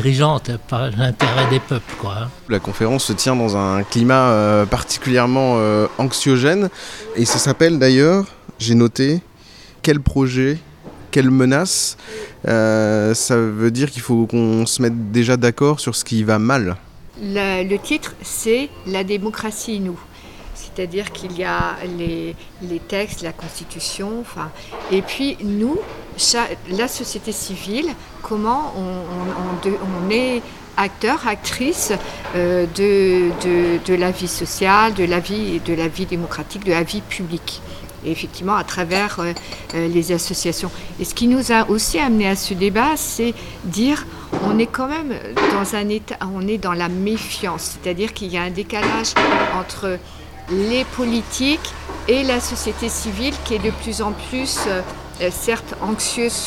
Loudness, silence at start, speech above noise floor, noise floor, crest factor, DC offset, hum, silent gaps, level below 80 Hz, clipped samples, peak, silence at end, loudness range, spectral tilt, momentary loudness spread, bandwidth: -19 LUFS; 0 s; 24 dB; -43 dBFS; 18 dB; under 0.1%; none; none; -40 dBFS; under 0.1%; 0 dBFS; 0 s; 7 LU; -4.5 dB/octave; 12 LU; 17 kHz